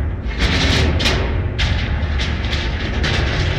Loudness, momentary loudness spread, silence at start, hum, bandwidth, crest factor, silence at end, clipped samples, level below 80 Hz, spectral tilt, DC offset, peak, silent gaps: -18 LUFS; 6 LU; 0 s; none; 12 kHz; 12 dB; 0 s; under 0.1%; -22 dBFS; -5 dB/octave; 0.4%; -6 dBFS; none